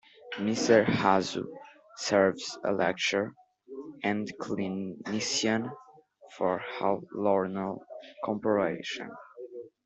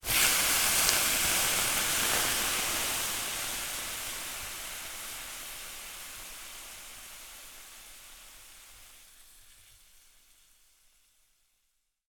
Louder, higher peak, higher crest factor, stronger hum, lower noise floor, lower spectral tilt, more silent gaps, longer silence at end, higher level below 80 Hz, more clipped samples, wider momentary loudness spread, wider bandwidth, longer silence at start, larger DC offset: about the same, -29 LUFS vs -28 LUFS; second, -8 dBFS vs -4 dBFS; second, 22 dB vs 30 dB; neither; second, -56 dBFS vs -77 dBFS; first, -4.5 dB/octave vs 0.5 dB/octave; neither; second, 0.2 s vs 2.45 s; second, -70 dBFS vs -54 dBFS; neither; second, 19 LU vs 24 LU; second, 8.2 kHz vs 19.5 kHz; first, 0.2 s vs 0.05 s; neither